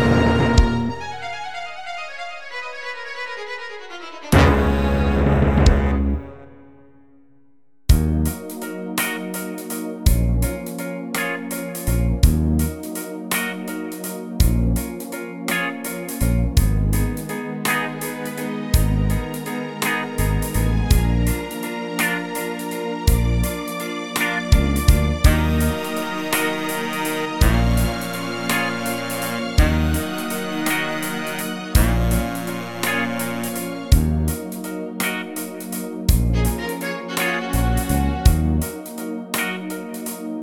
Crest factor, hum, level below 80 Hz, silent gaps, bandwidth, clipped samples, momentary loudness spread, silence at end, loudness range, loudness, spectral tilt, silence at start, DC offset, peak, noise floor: 20 dB; none; -24 dBFS; none; 19 kHz; under 0.1%; 12 LU; 0 s; 4 LU; -22 LUFS; -5 dB/octave; 0 s; 0.3%; 0 dBFS; -61 dBFS